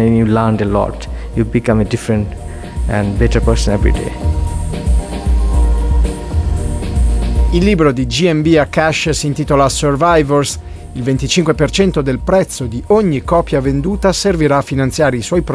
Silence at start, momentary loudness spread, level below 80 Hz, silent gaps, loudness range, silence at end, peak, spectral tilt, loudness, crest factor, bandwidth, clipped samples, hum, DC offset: 0 s; 8 LU; -20 dBFS; none; 3 LU; 0 s; 0 dBFS; -6 dB/octave; -14 LUFS; 12 dB; 11 kHz; under 0.1%; none; under 0.1%